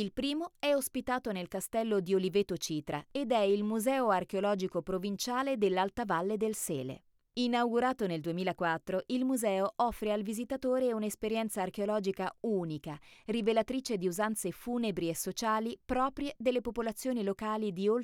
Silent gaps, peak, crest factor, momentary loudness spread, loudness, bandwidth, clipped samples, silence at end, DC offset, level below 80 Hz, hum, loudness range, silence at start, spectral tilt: none; -16 dBFS; 16 dB; 6 LU; -33 LUFS; 18.5 kHz; under 0.1%; 0 s; under 0.1%; -62 dBFS; none; 2 LU; 0 s; -4.5 dB/octave